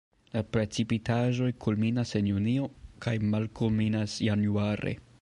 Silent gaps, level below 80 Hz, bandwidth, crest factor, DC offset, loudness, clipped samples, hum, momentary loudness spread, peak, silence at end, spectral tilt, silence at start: none; -52 dBFS; 11 kHz; 14 dB; under 0.1%; -29 LUFS; under 0.1%; none; 6 LU; -14 dBFS; 0.2 s; -7 dB/octave; 0.35 s